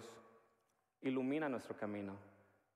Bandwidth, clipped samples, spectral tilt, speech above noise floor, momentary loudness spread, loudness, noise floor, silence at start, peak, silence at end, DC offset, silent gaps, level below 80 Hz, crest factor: 12.5 kHz; under 0.1%; -6.5 dB/octave; 40 dB; 18 LU; -43 LUFS; -82 dBFS; 0 s; -30 dBFS; 0.4 s; under 0.1%; none; under -90 dBFS; 16 dB